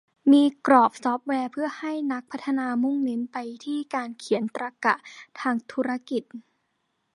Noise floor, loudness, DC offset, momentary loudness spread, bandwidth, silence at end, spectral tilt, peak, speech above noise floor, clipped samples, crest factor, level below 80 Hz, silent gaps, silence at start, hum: -75 dBFS; -25 LUFS; under 0.1%; 13 LU; 11.5 kHz; 0.75 s; -5 dB/octave; -4 dBFS; 50 dB; under 0.1%; 22 dB; -78 dBFS; none; 0.25 s; none